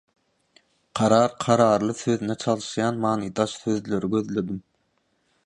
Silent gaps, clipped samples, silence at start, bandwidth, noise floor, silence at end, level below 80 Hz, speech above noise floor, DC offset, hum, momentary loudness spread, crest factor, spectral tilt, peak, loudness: none; under 0.1%; 0.95 s; 11 kHz; -70 dBFS; 0.85 s; -60 dBFS; 47 dB; under 0.1%; none; 9 LU; 20 dB; -5.5 dB/octave; -4 dBFS; -23 LUFS